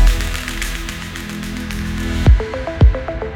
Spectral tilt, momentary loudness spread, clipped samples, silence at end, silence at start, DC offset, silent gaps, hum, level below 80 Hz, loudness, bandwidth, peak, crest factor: -5.5 dB/octave; 11 LU; under 0.1%; 0 s; 0 s; under 0.1%; none; none; -18 dBFS; -19 LUFS; 16.5 kHz; 0 dBFS; 16 dB